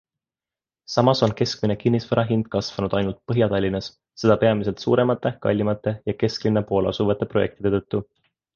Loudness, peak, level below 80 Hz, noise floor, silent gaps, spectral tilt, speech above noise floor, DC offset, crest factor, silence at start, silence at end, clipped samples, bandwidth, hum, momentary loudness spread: -22 LUFS; -2 dBFS; -48 dBFS; under -90 dBFS; none; -7 dB/octave; over 69 dB; under 0.1%; 20 dB; 0.9 s; 0.5 s; under 0.1%; 7.2 kHz; none; 7 LU